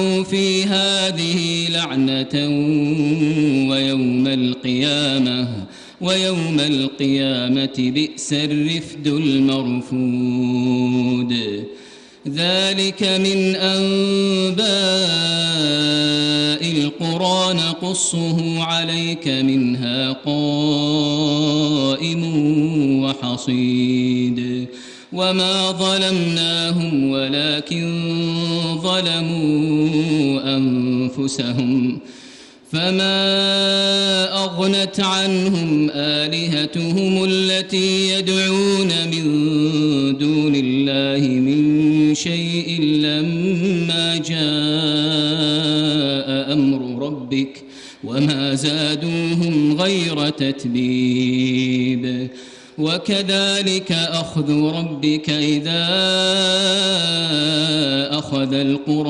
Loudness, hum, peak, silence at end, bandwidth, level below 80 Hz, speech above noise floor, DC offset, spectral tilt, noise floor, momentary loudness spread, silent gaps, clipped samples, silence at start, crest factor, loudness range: -18 LUFS; none; -4 dBFS; 0 s; 11 kHz; -58 dBFS; 24 dB; under 0.1%; -4.5 dB/octave; -42 dBFS; 5 LU; none; under 0.1%; 0 s; 14 dB; 3 LU